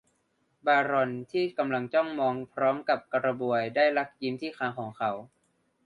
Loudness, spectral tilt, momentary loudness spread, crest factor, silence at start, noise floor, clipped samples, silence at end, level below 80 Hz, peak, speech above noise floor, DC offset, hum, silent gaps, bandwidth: -28 LUFS; -7 dB/octave; 8 LU; 18 dB; 0.65 s; -73 dBFS; under 0.1%; 0.6 s; -74 dBFS; -12 dBFS; 45 dB; under 0.1%; none; none; 10 kHz